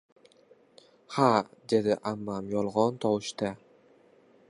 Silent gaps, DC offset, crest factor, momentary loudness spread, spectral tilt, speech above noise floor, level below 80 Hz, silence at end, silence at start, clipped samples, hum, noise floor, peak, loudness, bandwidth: none; under 0.1%; 22 dB; 11 LU; -6 dB/octave; 33 dB; -68 dBFS; 0.95 s; 1.1 s; under 0.1%; none; -60 dBFS; -8 dBFS; -29 LUFS; 11.5 kHz